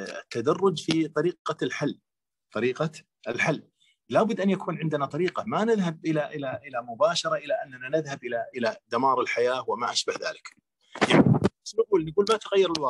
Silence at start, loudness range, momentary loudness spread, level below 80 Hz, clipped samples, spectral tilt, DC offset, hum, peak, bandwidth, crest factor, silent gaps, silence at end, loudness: 0 s; 4 LU; 10 LU; -62 dBFS; under 0.1%; -5.5 dB/octave; under 0.1%; none; -6 dBFS; 11.5 kHz; 22 dB; 1.39-1.45 s; 0 s; -26 LUFS